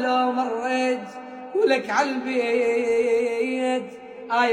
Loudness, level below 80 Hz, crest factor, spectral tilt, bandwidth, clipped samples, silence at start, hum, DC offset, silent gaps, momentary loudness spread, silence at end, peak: -23 LUFS; -70 dBFS; 16 dB; -3.5 dB/octave; 10.5 kHz; under 0.1%; 0 s; none; under 0.1%; none; 9 LU; 0 s; -8 dBFS